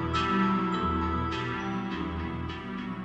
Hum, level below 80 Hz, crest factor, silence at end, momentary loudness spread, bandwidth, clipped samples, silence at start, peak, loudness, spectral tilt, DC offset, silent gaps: none; -42 dBFS; 14 dB; 0 s; 10 LU; 8.2 kHz; under 0.1%; 0 s; -14 dBFS; -30 LUFS; -7 dB/octave; under 0.1%; none